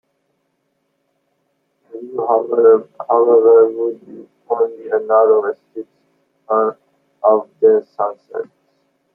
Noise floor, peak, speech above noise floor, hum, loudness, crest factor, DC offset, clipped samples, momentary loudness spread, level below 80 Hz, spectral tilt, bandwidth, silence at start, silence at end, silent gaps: -68 dBFS; -2 dBFS; 53 dB; none; -15 LUFS; 16 dB; under 0.1%; under 0.1%; 19 LU; -74 dBFS; -9.5 dB/octave; 1.9 kHz; 1.95 s; 0.7 s; none